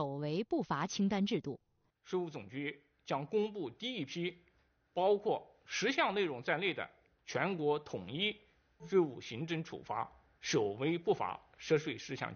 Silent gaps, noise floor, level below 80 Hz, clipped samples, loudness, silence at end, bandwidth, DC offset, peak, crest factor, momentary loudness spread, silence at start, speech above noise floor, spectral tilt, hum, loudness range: none; -73 dBFS; -74 dBFS; under 0.1%; -37 LUFS; 0 s; 6.8 kHz; under 0.1%; -18 dBFS; 20 dB; 11 LU; 0 s; 37 dB; -4 dB/octave; none; 3 LU